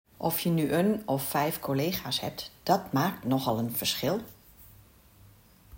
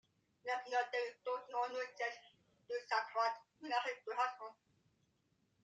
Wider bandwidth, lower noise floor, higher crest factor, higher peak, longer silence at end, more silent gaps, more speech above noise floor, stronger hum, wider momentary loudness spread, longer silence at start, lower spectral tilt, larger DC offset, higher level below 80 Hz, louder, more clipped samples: first, 17 kHz vs 9.2 kHz; second, -56 dBFS vs -80 dBFS; about the same, 20 dB vs 20 dB; first, -10 dBFS vs -24 dBFS; second, 0 s vs 1.1 s; neither; second, 28 dB vs 39 dB; neither; second, 5 LU vs 11 LU; second, 0.2 s vs 0.45 s; first, -5 dB/octave vs -1.5 dB/octave; neither; first, -60 dBFS vs under -90 dBFS; first, -29 LUFS vs -41 LUFS; neither